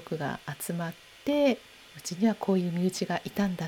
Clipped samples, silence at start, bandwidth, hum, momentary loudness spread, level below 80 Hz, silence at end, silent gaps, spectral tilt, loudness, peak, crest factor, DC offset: under 0.1%; 0 s; 20 kHz; none; 12 LU; -64 dBFS; 0 s; none; -5.5 dB/octave; -30 LUFS; -14 dBFS; 16 dB; under 0.1%